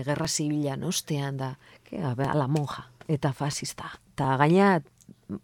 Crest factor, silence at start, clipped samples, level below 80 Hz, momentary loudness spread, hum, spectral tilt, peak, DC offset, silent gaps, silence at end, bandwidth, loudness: 20 dB; 0 s; under 0.1%; -58 dBFS; 18 LU; none; -5.5 dB/octave; -6 dBFS; under 0.1%; none; 0.05 s; 17.5 kHz; -27 LUFS